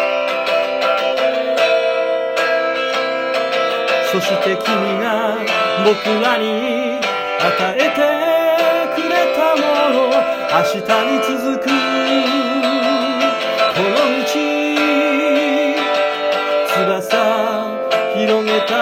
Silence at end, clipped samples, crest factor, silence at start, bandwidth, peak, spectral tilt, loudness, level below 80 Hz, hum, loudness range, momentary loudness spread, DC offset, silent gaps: 0 s; under 0.1%; 14 dB; 0 s; 16.5 kHz; 0 dBFS; -4 dB/octave; -16 LUFS; -62 dBFS; none; 2 LU; 3 LU; under 0.1%; none